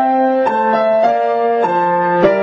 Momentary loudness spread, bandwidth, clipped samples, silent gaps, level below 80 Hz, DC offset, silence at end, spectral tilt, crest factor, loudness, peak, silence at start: 2 LU; 7.2 kHz; under 0.1%; none; -54 dBFS; under 0.1%; 0 s; -7.5 dB/octave; 12 dB; -14 LUFS; -2 dBFS; 0 s